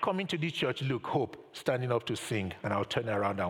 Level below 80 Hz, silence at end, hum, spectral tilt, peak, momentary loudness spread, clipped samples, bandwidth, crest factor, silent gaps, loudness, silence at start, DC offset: -68 dBFS; 0 s; none; -5.5 dB/octave; -14 dBFS; 3 LU; under 0.1%; 17 kHz; 18 dB; none; -33 LUFS; 0 s; under 0.1%